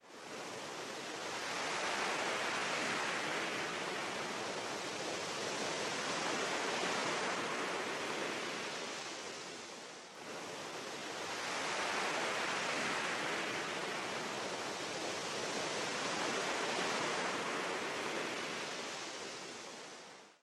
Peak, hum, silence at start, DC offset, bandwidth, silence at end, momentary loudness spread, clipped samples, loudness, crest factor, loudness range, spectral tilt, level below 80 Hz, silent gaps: -24 dBFS; none; 0.05 s; under 0.1%; 13 kHz; 0.1 s; 9 LU; under 0.1%; -38 LUFS; 16 dB; 4 LU; -2 dB/octave; -80 dBFS; none